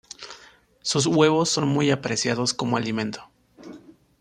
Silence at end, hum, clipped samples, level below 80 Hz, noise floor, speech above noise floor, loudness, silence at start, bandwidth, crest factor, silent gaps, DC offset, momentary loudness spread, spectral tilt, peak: 0.3 s; none; under 0.1%; -62 dBFS; -52 dBFS; 30 dB; -22 LUFS; 0.2 s; 13 kHz; 20 dB; none; under 0.1%; 21 LU; -4 dB/octave; -4 dBFS